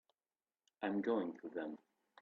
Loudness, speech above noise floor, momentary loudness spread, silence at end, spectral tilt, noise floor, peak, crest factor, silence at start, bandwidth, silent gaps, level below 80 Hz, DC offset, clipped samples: -42 LUFS; over 50 dB; 11 LU; 0.45 s; -5 dB/octave; under -90 dBFS; -26 dBFS; 18 dB; 0.8 s; 6.8 kHz; none; under -90 dBFS; under 0.1%; under 0.1%